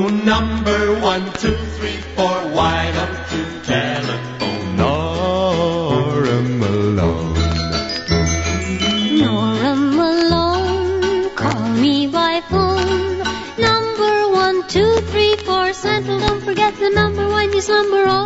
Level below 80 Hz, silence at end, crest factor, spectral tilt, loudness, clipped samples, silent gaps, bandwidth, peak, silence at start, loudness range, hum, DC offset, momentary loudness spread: -32 dBFS; 0 s; 16 dB; -5 dB/octave; -17 LUFS; under 0.1%; none; 8 kHz; 0 dBFS; 0 s; 3 LU; none; under 0.1%; 6 LU